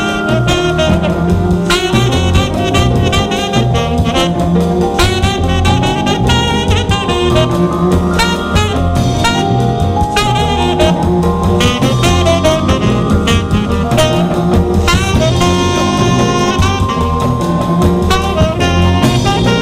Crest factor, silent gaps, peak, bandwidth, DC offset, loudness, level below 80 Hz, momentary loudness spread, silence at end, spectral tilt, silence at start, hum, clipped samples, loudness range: 12 dB; none; 0 dBFS; 16 kHz; under 0.1%; -12 LUFS; -22 dBFS; 2 LU; 0 s; -5.5 dB/octave; 0 s; none; under 0.1%; 1 LU